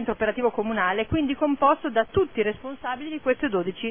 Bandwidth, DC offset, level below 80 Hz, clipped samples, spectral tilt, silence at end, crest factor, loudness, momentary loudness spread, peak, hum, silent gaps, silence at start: 3.6 kHz; 0.4%; -50 dBFS; under 0.1%; -10 dB/octave; 0 s; 18 dB; -25 LUFS; 8 LU; -6 dBFS; none; none; 0 s